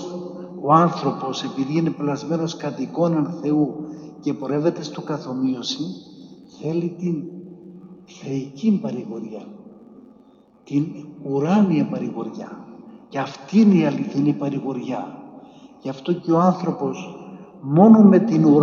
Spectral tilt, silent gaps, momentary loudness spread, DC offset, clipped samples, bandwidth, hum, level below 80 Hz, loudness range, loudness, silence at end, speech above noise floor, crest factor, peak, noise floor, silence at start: -7.5 dB/octave; none; 20 LU; under 0.1%; under 0.1%; 7.2 kHz; none; -68 dBFS; 7 LU; -21 LUFS; 0 s; 32 dB; 20 dB; 0 dBFS; -52 dBFS; 0 s